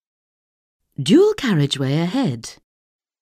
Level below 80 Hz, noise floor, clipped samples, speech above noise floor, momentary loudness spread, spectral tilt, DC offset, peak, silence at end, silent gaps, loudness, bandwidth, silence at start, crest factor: -56 dBFS; under -90 dBFS; under 0.1%; over 72 dB; 18 LU; -6 dB/octave; under 0.1%; -4 dBFS; 0.7 s; none; -18 LUFS; 15.5 kHz; 1 s; 16 dB